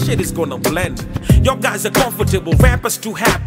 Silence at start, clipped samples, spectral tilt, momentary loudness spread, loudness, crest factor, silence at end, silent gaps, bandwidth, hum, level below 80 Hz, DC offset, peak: 0 s; under 0.1%; -5 dB/octave; 7 LU; -16 LUFS; 14 dB; 0 s; none; 16.5 kHz; none; -22 dBFS; under 0.1%; 0 dBFS